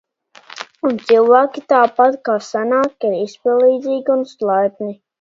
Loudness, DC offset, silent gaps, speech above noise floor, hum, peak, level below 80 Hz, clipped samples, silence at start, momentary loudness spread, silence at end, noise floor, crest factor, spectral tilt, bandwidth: -16 LUFS; under 0.1%; none; 28 dB; none; 0 dBFS; -70 dBFS; under 0.1%; 0.55 s; 9 LU; 0.25 s; -43 dBFS; 16 dB; -5.5 dB/octave; 7.6 kHz